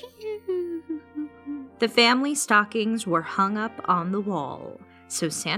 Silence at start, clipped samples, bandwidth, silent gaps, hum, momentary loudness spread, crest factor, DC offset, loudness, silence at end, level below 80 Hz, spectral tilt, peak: 0 s; under 0.1%; 16 kHz; none; none; 17 LU; 20 dB; under 0.1%; -24 LUFS; 0 s; -70 dBFS; -3.5 dB/octave; -6 dBFS